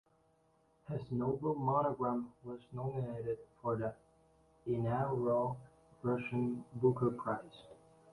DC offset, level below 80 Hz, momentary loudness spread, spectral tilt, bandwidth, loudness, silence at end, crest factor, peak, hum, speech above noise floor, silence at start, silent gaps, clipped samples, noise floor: under 0.1%; -68 dBFS; 12 LU; -10 dB/octave; 11 kHz; -37 LUFS; 0.4 s; 20 dB; -18 dBFS; none; 36 dB; 0.9 s; none; under 0.1%; -72 dBFS